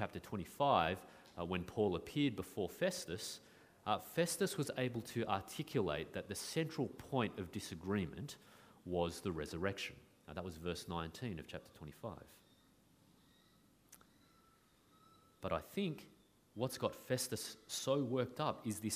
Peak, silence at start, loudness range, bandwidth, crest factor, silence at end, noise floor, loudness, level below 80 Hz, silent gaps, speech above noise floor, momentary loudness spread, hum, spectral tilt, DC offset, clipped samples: -18 dBFS; 0 s; 11 LU; 15.5 kHz; 24 dB; 0 s; -71 dBFS; -41 LUFS; -66 dBFS; none; 30 dB; 13 LU; none; -4.5 dB/octave; under 0.1%; under 0.1%